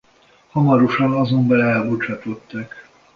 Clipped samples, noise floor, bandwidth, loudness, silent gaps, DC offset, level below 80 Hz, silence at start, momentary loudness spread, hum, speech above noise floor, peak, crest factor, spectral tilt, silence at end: under 0.1%; -54 dBFS; 6.6 kHz; -18 LUFS; none; under 0.1%; -56 dBFS; 0.55 s; 16 LU; none; 36 dB; -2 dBFS; 16 dB; -9 dB/octave; 0.35 s